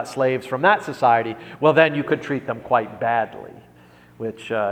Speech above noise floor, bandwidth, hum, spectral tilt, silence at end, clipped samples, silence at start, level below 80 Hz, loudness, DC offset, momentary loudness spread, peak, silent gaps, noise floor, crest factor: 29 dB; 14.5 kHz; 60 Hz at -50 dBFS; -6 dB/octave; 0 s; under 0.1%; 0 s; -62 dBFS; -20 LUFS; under 0.1%; 14 LU; 0 dBFS; none; -49 dBFS; 20 dB